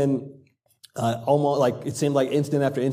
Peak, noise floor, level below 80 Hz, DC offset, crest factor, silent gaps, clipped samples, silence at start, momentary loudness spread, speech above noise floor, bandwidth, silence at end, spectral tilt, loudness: -8 dBFS; -56 dBFS; -68 dBFS; under 0.1%; 16 dB; none; under 0.1%; 0 s; 8 LU; 33 dB; 15.5 kHz; 0 s; -6.5 dB/octave; -23 LUFS